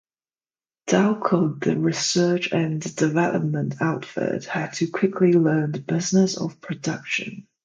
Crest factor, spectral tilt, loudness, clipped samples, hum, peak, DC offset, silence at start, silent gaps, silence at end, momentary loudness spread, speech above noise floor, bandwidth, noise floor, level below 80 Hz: 18 dB; -5.5 dB/octave; -22 LUFS; under 0.1%; none; -4 dBFS; under 0.1%; 0.85 s; none; 0.25 s; 9 LU; over 68 dB; 9.4 kHz; under -90 dBFS; -66 dBFS